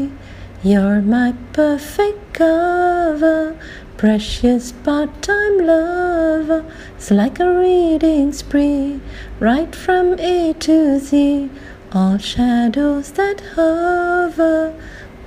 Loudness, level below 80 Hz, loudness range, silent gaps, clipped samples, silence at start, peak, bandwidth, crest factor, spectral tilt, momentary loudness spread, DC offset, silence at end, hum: -16 LUFS; -36 dBFS; 1 LU; none; under 0.1%; 0 s; -2 dBFS; 15.5 kHz; 12 dB; -6 dB/octave; 10 LU; under 0.1%; 0 s; none